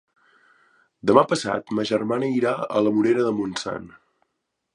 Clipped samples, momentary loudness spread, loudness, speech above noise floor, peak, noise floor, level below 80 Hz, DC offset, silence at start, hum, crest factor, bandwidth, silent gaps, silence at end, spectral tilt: under 0.1%; 10 LU; -22 LUFS; 56 dB; 0 dBFS; -78 dBFS; -62 dBFS; under 0.1%; 1.05 s; none; 22 dB; 11.5 kHz; none; 0.85 s; -5.5 dB/octave